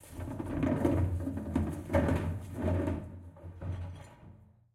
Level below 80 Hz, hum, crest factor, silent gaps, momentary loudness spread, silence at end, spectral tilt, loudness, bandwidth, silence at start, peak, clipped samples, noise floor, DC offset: -48 dBFS; none; 20 dB; none; 18 LU; 0.3 s; -8.5 dB/octave; -34 LUFS; 14 kHz; 0 s; -14 dBFS; under 0.1%; -56 dBFS; under 0.1%